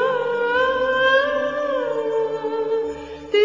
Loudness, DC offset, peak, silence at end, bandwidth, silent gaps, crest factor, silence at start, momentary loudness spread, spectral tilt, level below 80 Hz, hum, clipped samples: -21 LUFS; 0.2%; -6 dBFS; 0 s; 7.6 kHz; none; 14 dB; 0 s; 8 LU; -4 dB/octave; -54 dBFS; none; under 0.1%